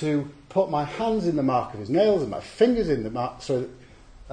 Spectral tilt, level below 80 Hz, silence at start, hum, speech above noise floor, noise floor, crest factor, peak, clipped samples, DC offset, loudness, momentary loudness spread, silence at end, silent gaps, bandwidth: -7 dB/octave; -50 dBFS; 0 s; none; 22 dB; -46 dBFS; 18 dB; -6 dBFS; under 0.1%; under 0.1%; -25 LUFS; 8 LU; 0 s; none; 9.8 kHz